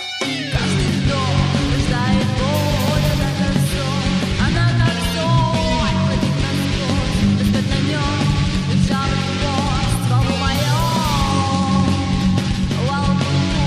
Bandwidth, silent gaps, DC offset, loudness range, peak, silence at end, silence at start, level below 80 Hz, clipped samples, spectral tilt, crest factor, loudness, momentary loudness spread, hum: 15.5 kHz; none; under 0.1%; 0 LU; -4 dBFS; 0 s; 0 s; -28 dBFS; under 0.1%; -5.5 dB/octave; 14 dB; -18 LUFS; 3 LU; none